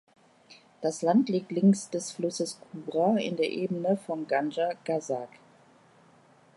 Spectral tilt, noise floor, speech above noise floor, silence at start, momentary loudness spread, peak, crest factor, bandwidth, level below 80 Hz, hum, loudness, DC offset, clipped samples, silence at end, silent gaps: -6 dB/octave; -59 dBFS; 31 dB; 0.5 s; 10 LU; -12 dBFS; 18 dB; 11.5 kHz; -80 dBFS; none; -29 LUFS; under 0.1%; under 0.1%; 1.3 s; none